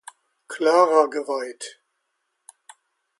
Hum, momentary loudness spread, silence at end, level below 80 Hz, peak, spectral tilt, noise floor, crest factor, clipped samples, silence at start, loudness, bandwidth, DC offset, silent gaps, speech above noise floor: none; 21 LU; 1.5 s; -84 dBFS; -4 dBFS; -2.5 dB/octave; -76 dBFS; 20 dB; under 0.1%; 0.5 s; -20 LUFS; 11.5 kHz; under 0.1%; none; 55 dB